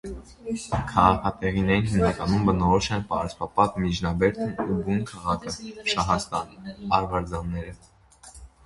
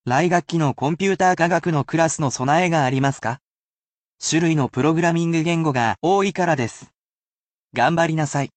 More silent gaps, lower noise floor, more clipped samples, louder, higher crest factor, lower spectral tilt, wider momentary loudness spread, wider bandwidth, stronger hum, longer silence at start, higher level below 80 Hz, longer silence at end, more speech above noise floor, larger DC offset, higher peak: second, none vs 3.42-4.11 s, 6.95-7.68 s; second, -49 dBFS vs under -90 dBFS; neither; second, -25 LUFS vs -20 LUFS; first, 22 dB vs 16 dB; about the same, -6 dB/octave vs -5.5 dB/octave; first, 13 LU vs 5 LU; first, 11.5 kHz vs 9 kHz; neither; about the same, 0.05 s vs 0.05 s; first, -40 dBFS vs -58 dBFS; about the same, 0.2 s vs 0.1 s; second, 25 dB vs over 71 dB; neither; first, -2 dBFS vs -6 dBFS